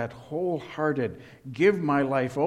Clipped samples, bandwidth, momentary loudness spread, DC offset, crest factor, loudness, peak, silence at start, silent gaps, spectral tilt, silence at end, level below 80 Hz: under 0.1%; 12 kHz; 10 LU; under 0.1%; 18 dB; -26 LUFS; -8 dBFS; 0 s; none; -7.5 dB/octave; 0 s; -64 dBFS